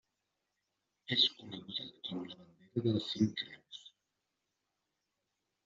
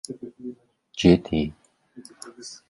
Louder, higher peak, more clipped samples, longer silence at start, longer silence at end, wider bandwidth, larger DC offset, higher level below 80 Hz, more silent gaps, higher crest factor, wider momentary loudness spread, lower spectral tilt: second, -35 LUFS vs -22 LUFS; second, -16 dBFS vs -4 dBFS; neither; first, 1.1 s vs 0.1 s; first, 1.8 s vs 0.15 s; second, 7.6 kHz vs 11.5 kHz; neither; second, -78 dBFS vs -46 dBFS; neither; about the same, 24 dB vs 22 dB; about the same, 22 LU vs 22 LU; second, -4 dB/octave vs -6 dB/octave